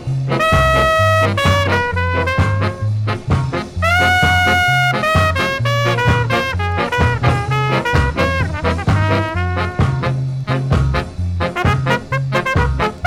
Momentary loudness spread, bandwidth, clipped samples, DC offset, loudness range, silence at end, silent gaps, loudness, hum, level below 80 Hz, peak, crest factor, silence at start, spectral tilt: 7 LU; 16.5 kHz; under 0.1%; under 0.1%; 4 LU; 0 s; none; -16 LUFS; none; -28 dBFS; 0 dBFS; 14 dB; 0 s; -5.5 dB/octave